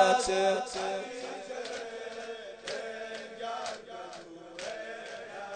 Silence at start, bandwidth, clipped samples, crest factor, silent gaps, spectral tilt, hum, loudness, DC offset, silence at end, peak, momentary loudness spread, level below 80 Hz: 0 s; 9.4 kHz; under 0.1%; 24 dB; none; -2.5 dB/octave; none; -35 LUFS; under 0.1%; 0 s; -10 dBFS; 15 LU; -66 dBFS